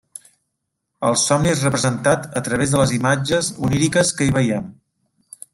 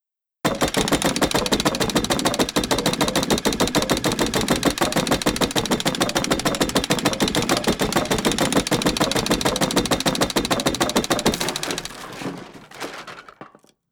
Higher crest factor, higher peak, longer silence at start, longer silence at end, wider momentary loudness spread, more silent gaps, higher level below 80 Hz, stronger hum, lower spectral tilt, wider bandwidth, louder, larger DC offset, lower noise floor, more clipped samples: about the same, 18 dB vs 20 dB; about the same, -2 dBFS vs -2 dBFS; first, 1 s vs 0.45 s; first, 0.8 s vs 0.45 s; second, 9 LU vs 12 LU; neither; second, -46 dBFS vs -40 dBFS; neither; about the same, -4.5 dB/octave vs -3.5 dB/octave; second, 15 kHz vs over 20 kHz; about the same, -18 LUFS vs -20 LUFS; neither; first, -76 dBFS vs -46 dBFS; neither